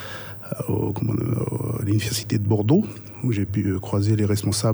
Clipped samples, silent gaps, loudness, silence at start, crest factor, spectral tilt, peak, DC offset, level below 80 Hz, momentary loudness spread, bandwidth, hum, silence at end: under 0.1%; none; -23 LUFS; 0 s; 16 dB; -6 dB/octave; -6 dBFS; under 0.1%; -50 dBFS; 9 LU; over 20 kHz; none; 0 s